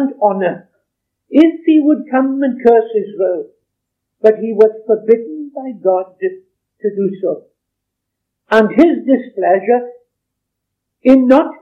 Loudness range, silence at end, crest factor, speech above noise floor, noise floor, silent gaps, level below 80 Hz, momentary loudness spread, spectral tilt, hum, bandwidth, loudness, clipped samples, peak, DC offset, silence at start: 5 LU; 0.05 s; 14 dB; 64 dB; -76 dBFS; none; -58 dBFS; 12 LU; -8 dB/octave; none; 6.6 kHz; -14 LUFS; 0.4%; 0 dBFS; under 0.1%; 0 s